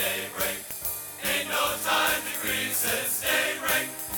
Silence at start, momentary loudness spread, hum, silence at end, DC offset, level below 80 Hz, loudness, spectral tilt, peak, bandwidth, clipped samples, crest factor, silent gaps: 0 s; 7 LU; none; 0 s; under 0.1%; -56 dBFS; -26 LUFS; -0.5 dB/octave; -10 dBFS; over 20 kHz; under 0.1%; 18 dB; none